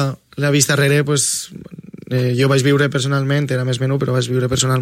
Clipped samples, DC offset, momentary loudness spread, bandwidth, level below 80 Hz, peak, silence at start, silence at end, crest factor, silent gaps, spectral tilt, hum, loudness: under 0.1%; under 0.1%; 9 LU; 16 kHz; -50 dBFS; 0 dBFS; 0 s; 0 s; 16 dB; none; -4.5 dB/octave; none; -17 LUFS